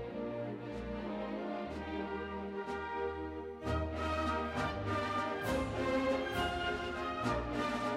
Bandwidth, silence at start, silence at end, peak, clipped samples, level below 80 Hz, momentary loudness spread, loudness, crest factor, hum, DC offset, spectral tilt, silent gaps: 15 kHz; 0 s; 0 s; -22 dBFS; under 0.1%; -52 dBFS; 7 LU; -37 LUFS; 16 dB; none; under 0.1%; -6 dB/octave; none